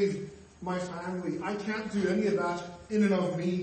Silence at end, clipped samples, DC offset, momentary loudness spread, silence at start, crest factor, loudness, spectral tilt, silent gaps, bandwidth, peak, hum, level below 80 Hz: 0 s; under 0.1%; under 0.1%; 11 LU; 0 s; 14 dB; -31 LUFS; -6.5 dB/octave; none; 8.8 kHz; -16 dBFS; none; -64 dBFS